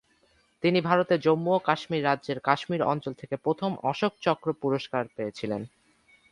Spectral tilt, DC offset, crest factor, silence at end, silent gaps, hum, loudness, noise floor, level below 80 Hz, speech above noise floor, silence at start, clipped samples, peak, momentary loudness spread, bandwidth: -7 dB/octave; under 0.1%; 22 dB; 0.65 s; none; none; -27 LUFS; -66 dBFS; -68 dBFS; 39 dB; 0.65 s; under 0.1%; -6 dBFS; 10 LU; 11 kHz